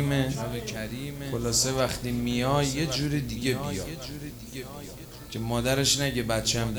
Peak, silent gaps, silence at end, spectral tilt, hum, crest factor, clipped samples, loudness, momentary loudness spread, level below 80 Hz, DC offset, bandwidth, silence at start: -10 dBFS; none; 0 s; -4 dB/octave; none; 18 dB; under 0.1%; -27 LUFS; 15 LU; -44 dBFS; under 0.1%; over 20 kHz; 0 s